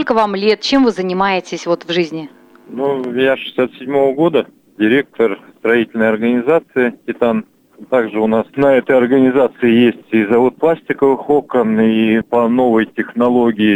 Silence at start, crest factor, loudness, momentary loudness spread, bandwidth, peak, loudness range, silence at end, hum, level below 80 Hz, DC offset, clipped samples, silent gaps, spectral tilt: 0 s; 12 dB; -14 LUFS; 7 LU; 9 kHz; -2 dBFS; 4 LU; 0 s; none; -54 dBFS; under 0.1%; under 0.1%; none; -6.5 dB/octave